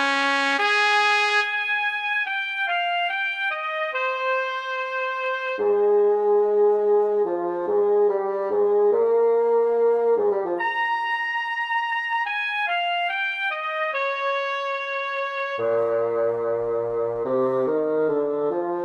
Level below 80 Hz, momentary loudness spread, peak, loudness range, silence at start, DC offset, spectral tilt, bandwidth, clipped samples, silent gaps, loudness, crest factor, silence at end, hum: -68 dBFS; 6 LU; -6 dBFS; 4 LU; 0 s; under 0.1%; -3.5 dB/octave; 9.8 kHz; under 0.1%; none; -22 LUFS; 16 dB; 0 s; none